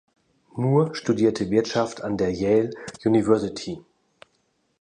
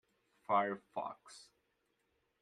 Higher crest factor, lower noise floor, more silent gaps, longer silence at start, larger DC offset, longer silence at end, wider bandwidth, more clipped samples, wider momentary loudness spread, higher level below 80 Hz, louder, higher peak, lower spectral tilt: about the same, 20 dB vs 22 dB; second, -69 dBFS vs -81 dBFS; neither; about the same, 0.55 s vs 0.5 s; neither; about the same, 1.05 s vs 1 s; second, 10 kHz vs 11.5 kHz; neither; second, 12 LU vs 22 LU; first, -54 dBFS vs -88 dBFS; first, -23 LUFS vs -38 LUFS; first, -4 dBFS vs -20 dBFS; first, -6.5 dB/octave vs -5 dB/octave